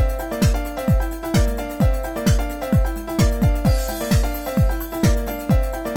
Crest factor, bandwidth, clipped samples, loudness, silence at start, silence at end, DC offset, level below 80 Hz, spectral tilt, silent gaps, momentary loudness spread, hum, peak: 14 dB; 17.5 kHz; under 0.1%; -21 LUFS; 0 s; 0 s; under 0.1%; -22 dBFS; -6 dB/octave; none; 4 LU; none; -6 dBFS